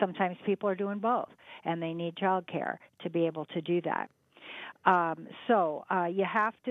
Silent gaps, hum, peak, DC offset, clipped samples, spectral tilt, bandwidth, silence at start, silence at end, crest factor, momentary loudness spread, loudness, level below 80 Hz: none; none; -8 dBFS; under 0.1%; under 0.1%; -8.5 dB/octave; 4.1 kHz; 0 s; 0 s; 24 dB; 12 LU; -31 LUFS; -84 dBFS